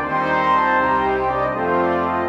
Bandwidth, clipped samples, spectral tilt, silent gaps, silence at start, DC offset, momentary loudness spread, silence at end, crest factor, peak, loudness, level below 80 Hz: 8 kHz; under 0.1%; -7 dB/octave; none; 0 s; under 0.1%; 4 LU; 0 s; 12 dB; -6 dBFS; -18 LUFS; -44 dBFS